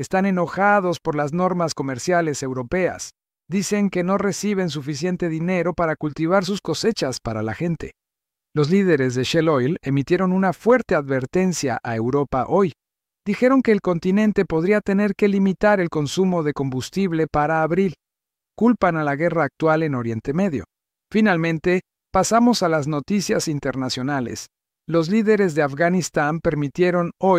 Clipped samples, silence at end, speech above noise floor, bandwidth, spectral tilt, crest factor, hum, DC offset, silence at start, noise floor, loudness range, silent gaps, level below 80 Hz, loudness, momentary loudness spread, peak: under 0.1%; 0 s; 67 dB; 15 kHz; -6 dB/octave; 16 dB; none; under 0.1%; 0 s; -87 dBFS; 3 LU; none; -50 dBFS; -21 LUFS; 7 LU; -4 dBFS